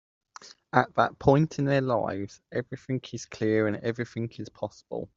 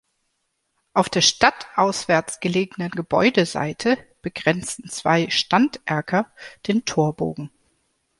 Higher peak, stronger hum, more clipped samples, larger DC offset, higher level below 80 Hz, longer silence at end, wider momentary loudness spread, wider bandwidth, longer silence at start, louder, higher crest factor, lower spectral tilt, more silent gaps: about the same, -4 dBFS vs -2 dBFS; neither; neither; neither; about the same, -58 dBFS vs -58 dBFS; second, 0.1 s vs 0.75 s; first, 14 LU vs 11 LU; second, 7.6 kHz vs 11.5 kHz; second, 0.45 s vs 0.95 s; second, -28 LUFS vs -21 LUFS; about the same, 24 dB vs 20 dB; first, -7 dB/octave vs -4 dB/octave; neither